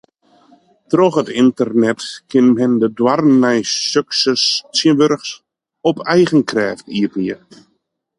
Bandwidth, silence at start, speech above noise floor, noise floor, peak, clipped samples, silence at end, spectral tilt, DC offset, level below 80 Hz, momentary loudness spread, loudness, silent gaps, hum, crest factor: 11 kHz; 0.9 s; 52 dB; -67 dBFS; 0 dBFS; under 0.1%; 0.8 s; -4.5 dB/octave; under 0.1%; -60 dBFS; 9 LU; -15 LUFS; none; none; 14 dB